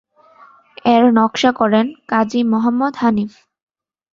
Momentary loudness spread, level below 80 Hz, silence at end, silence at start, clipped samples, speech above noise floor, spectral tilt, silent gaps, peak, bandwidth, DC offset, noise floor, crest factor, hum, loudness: 7 LU; -58 dBFS; 0.85 s; 0.85 s; under 0.1%; 32 dB; -5.5 dB/octave; none; 0 dBFS; 7.4 kHz; under 0.1%; -47 dBFS; 16 dB; none; -15 LUFS